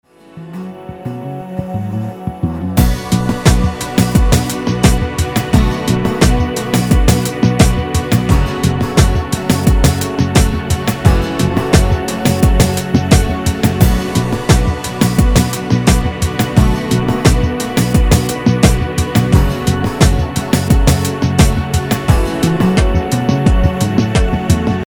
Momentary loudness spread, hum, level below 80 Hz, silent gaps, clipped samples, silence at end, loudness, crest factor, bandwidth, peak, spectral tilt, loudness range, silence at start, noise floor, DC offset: 6 LU; none; -18 dBFS; none; 0.4%; 0.05 s; -14 LUFS; 12 dB; over 20 kHz; 0 dBFS; -5.5 dB/octave; 1 LU; 0.35 s; -33 dBFS; under 0.1%